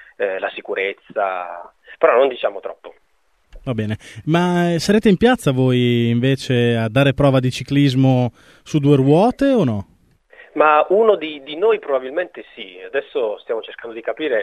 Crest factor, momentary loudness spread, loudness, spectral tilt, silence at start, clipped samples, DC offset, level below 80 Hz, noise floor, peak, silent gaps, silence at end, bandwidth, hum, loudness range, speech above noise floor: 18 dB; 13 LU; -18 LUFS; -7 dB/octave; 0.2 s; under 0.1%; under 0.1%; -48 dBFS; -56 dBFS; 0 dBFS; none; 0 s; 13.5 kHz; none; 5 LU; 39 dB